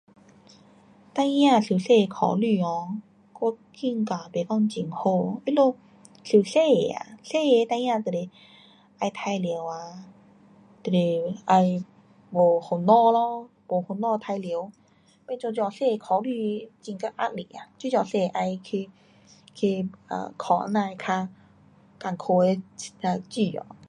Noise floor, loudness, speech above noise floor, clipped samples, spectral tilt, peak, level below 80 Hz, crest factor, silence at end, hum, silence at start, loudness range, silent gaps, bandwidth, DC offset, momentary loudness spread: -56 dBFS; -25 LUFS; 31 dB; under 0.1%; -6.5 dB/octave; -6 dBFS; -72 dBFS; 18 dB; 0.05 s; none; 1.15 s; 6 LU; none; 11 kHz; under 0.1%; 15 LU